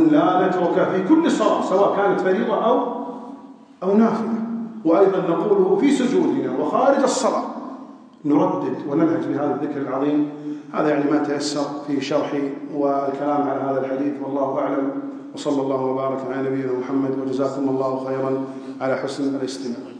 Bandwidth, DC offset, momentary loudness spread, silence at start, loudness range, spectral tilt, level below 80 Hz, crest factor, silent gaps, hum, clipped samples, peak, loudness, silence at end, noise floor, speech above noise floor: 10 kHz; under 0.1%; 10 LU; 0 s; 5 LU; -6 dB/octave; -78 dBFS; 18 dB; none; none; under 0.1%; -4 dBFS; -21 LUFS; 0 s; -41 dBFS; 21 dB